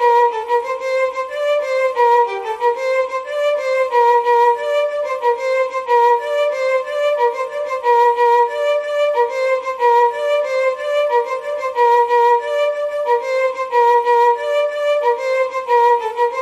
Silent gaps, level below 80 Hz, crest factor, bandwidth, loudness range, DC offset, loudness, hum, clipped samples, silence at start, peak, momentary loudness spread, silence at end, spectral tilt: none; -66 dBFS; 12 dB; 13 kHz; 2 LU; under 0.1%; -16 LUFS; none; under 0.1%; 0 s; -4 dBFS; 6 LU; 0 s; -0.5 dB/octave